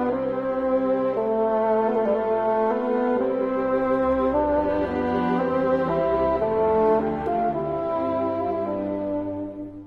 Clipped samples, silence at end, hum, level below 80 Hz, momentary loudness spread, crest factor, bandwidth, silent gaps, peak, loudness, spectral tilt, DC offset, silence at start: under 0.1%; 0 s; none; -48 dBFS; 5 LU; 12 dB; 5.6 kHz; none; -10 dBFS; -23 LUFS; -9 dB/octave; under 0.1%; 0 s